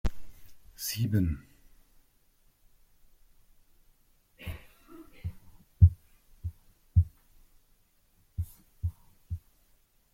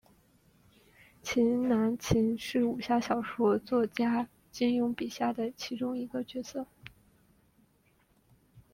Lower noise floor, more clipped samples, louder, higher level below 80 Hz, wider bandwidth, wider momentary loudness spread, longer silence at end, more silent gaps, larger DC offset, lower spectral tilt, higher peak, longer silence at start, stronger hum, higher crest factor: about the same, -66 dBFS vs -68 dBFS; neither; about the same, -32 LUFS vs -31 LUFS; first, -44 dBFS vs -58 dBFS; about the same, 16 kHz vs 16 kHz; first, 22 LU vs 11 LU; first, 0.75 s vs 0.15 s; neither; neither; about the same, -6 dB/octave vs -5.5 dB/octave; first, -6 dBFS vs -12 dBFS; second, 0.05 s vs 1.25 s; neither; first, 26 dB vs 20 dB